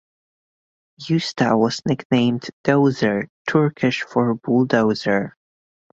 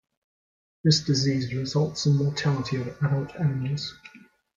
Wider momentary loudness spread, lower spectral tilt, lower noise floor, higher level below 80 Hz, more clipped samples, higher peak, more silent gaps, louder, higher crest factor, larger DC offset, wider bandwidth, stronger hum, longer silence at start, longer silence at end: about the same, 6 LU vs 8 LU; about the same, -6.5 dB/octave vs -5.5 dB/octave; about the same, under -90 dBFS vs under -90 dBFS; about the same, -58 dBFS vs -58 dBFS; neither; first, -2 dBFS vs -8 dBFS; first, 2.05-2.10 s, 2.53-2.64 s, 3.29-3.45 s vs none; first, -20 LUFS vs -25 LUFS; about the same, 18 dB vs 18 dB; neither; about the same, 7.8 kHz vs 7.6 kHz; neither; first, 1 s vs 0.85 s; first, 0.65 s vs 0.4 s